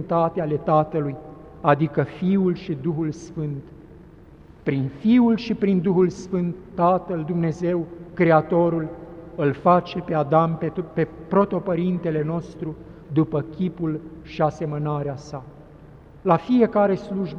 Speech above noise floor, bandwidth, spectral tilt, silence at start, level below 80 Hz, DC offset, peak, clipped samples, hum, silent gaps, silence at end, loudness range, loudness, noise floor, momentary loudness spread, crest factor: 25 dB; 7.4 kHz; -8.5 dB/octave; 0 s; -50 dBFS; under 0.1%; -2 dBFS; under 0.1%; none; none; 0 s; 5 LU; -22 LUFS; -46 dBFS; 13 LU; 20 dB